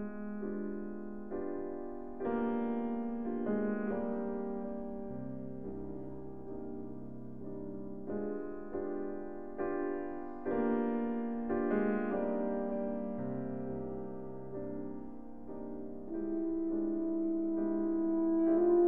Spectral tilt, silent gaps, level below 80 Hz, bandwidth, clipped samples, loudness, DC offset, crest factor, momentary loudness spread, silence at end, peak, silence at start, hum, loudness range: -11 dB/octave; none; -60 dBFS; 3.3 kHz; under 0.1%; -37 LUFS; 0.5%; 16 dB; 12 LU; 0 s; -20 dBFS; 0 s; none; 8 LU